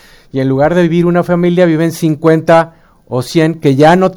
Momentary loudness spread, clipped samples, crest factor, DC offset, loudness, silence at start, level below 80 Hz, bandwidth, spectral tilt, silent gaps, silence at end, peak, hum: 10 LU; 0.4%; 10 dB; under 0.1%; -11 LUFS; 0.35 s; -42 dBFS; 17 kHz; -7 dB/octave; none; 0 s; 0 dBFS; none